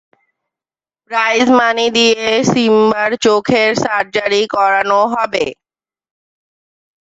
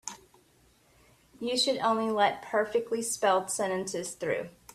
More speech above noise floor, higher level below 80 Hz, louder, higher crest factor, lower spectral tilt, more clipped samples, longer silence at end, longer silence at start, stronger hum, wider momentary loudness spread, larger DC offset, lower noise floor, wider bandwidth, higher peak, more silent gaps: first, over 77 dB vs 35 dB; first, -56 dBFS vs -70 dBFS; first, -13 LUFS vs -29 LUFS; second, 14 dB vs 20 dB; about the same, -3.5 dB/octave vs -2.5 dB/octave; neither; first, 1.5 s vs 0.25 s; first, 1.1 s vs 0.05 s; neither; second, 5 LU vs 8 LU; neither; first, under -90 dBFS vs -64 dBFS; second, 8 kHz vs 15.5 kHz; first, 0 dBFS vs -12 dBFS; neither